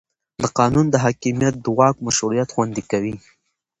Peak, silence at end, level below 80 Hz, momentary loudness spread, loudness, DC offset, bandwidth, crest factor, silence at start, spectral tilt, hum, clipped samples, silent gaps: 0 dBFS; 0.6 s; -50 dBFS; 7 LU; -19 LUFS; under 0.1%; 9.6 kHz; 20 dB; 0.4 s; -5 dB/octave; none; under 0.1%; none